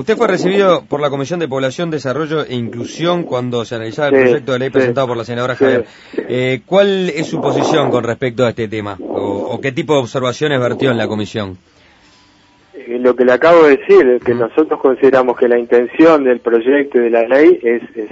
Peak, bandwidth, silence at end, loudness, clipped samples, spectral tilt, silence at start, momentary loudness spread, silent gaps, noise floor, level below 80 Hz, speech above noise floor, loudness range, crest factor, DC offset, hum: 0 dBFS; 8 kHz; 0.05 s; -14 LUFS; under 0.1%; -6 dB/octave; 0 s; 11 LU; none; -49 dBFS; -54 dBFS; 36 dB; 7 LU; 14 dB; under 0.1%; none